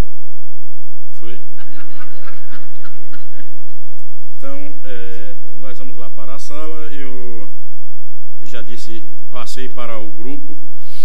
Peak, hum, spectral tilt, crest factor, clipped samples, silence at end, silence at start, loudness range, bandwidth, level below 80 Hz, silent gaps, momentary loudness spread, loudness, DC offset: 0 dBFS; none; -6.5 dB/octave; 22 dB; under 0.1%; 0 s; 0 s; 8 LU; 17.5 kHz; -56 dBFS; none; 19 LU; -36 LUFS; 90%